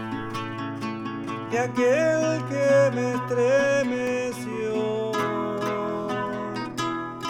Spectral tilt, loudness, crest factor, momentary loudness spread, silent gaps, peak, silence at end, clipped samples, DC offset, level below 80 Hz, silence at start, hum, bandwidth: -5.5 dB/octave; -25 LUFS; 14 dB; 11 LU; none; -10 dBFS; 0 s; under 0.1%; under 0.1%; -62 dBFS; 0 s; none; 15 kHz